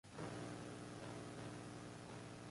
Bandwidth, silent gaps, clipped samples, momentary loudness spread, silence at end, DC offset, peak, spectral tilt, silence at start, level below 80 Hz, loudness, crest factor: 11.5 kHz; none; under 0.1%; 4 LU; 0 s; under 0.1%; -36 dBFS; -5 dB/octave; 0.05 s; -72 dBFS; -52 LUFS; 14 dB